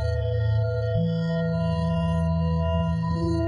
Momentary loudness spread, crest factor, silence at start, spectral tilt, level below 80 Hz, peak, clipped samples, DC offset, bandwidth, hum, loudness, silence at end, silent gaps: 1 LU; 10 dB; 0 s; -9 dB/octave; -38 dBFS; -14 dBFS; under 0.1%; under 0.1%; 9.2 kHz; none; -25 LUFS; 0 s; none